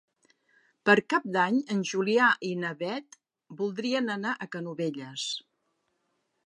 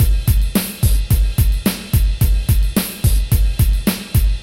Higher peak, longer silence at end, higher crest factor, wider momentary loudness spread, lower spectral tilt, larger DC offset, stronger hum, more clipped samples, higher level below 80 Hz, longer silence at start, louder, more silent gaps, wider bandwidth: second, -6 dBFS vs -2 dBFS; first, 1.1 s vs 0 s; first, 24 dB vs 12 dB; first, 12 LU vs 2 LU; about the same, -4.5 dB/octave vs -5.5 dB/octave; neither; neither; neither; second, -82 dBFS vs -16 dBFS; first, 0.85 s vs 0 s; second, -28 LUFS vs -17 LUFS; neither; second, 11 kHz vs 17 kHz